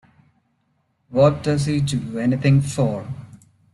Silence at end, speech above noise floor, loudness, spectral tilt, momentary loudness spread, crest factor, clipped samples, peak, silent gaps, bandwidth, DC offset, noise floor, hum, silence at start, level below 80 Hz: 0.4 s; 49 dB; -20 LUFS; -7 dB/octave; 12 LU; 18 dB; under 0.1%; -4 dBFS; none; 12 kHz; under 0.1%; -67 dBFS; none; 1.1 s; -52 dBFS